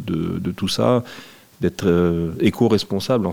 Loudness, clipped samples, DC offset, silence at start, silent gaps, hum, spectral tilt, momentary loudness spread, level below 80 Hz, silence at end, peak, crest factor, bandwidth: -20 LUFS; under 0.1%; under 0.1%; 0 s; none; none; -6.5 dB/octave; 7 LU; -50 dBFS; 0 s; -2 dBFS; 18 dB; 17 kHz